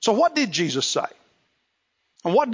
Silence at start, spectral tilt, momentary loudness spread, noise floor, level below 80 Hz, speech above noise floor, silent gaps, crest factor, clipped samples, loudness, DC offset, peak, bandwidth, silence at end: 0 s; -3.5 dB/octave; 10 LU; -73 dBFS; -74 dBFS; 52 dB; none; 16 dB; under 0.1%; -22 LUFS; under 0.1%; -8 dBFS; 7.6 kHz; 0 s